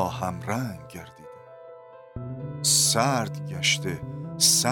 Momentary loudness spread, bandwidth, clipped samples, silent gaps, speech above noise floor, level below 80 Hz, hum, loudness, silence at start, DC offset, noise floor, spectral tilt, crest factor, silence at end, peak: 22 LU; 17.5 kHz; under 0.1%; none; 20 dB; -56 dBFS; none; -23 LUFS; 0 s; under 0.1%; -46 dBFS; -2.5 dB/octave; 20 dB; 0 s; -6 dBFS